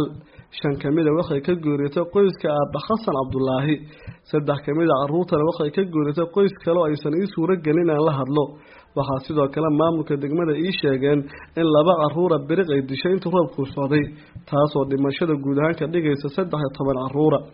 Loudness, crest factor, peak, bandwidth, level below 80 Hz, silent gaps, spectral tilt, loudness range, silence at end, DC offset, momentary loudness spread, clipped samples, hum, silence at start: -21 LUFS; 18 dB; -2 dBFS; 5.4 kHz; -52 dBFS; none; -6.5 dB/octave; 2 LU; 0.05 s; under 0.1%; 6 LU; under 0.1%; none; 0 s